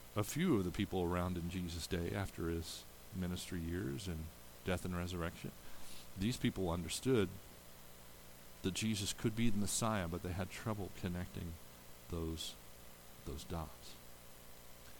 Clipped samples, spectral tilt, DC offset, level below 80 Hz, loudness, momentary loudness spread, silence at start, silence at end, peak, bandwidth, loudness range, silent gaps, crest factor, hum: under 0.1%; -5 dB/octave; under 0.1%; -56 dBFS; -41 LUFS; 20 LU; 0 s; 0 s; -20 dBFS; 19 kHz; 7 LU; none; 20 dB; 60 Hz at -65 dBFS